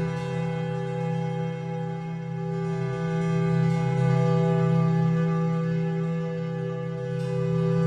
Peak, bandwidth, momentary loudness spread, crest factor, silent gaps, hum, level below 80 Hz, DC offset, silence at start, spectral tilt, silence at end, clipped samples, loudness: -12 dBFS; 7.6 kHz; 9 LU; 12 dB; none; none; -56 dBFS; under 0.1%; 0 s; -8.5 dB/octave; 0 s; under 0.1%; -26 LUFS